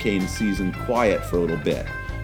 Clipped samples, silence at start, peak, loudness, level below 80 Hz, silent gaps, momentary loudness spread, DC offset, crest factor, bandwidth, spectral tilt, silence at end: under 0.1%; 0 s; -6 dBFS; -24 LUFS; -36 dBFS; none; 6 LU; under 0.1%; 18 dB; 19 kHz; -6 dB/octave; 0 s